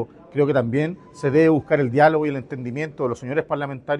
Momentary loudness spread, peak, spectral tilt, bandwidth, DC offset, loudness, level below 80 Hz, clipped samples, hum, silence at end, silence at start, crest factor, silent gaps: 11 LU; -4 dBFS; -8 dB/octave; 10 kHz; under 0.1%; -21 LUFS; -58 dBFS; under 0.1%; none; 0 s; 0 s; 18 dB; none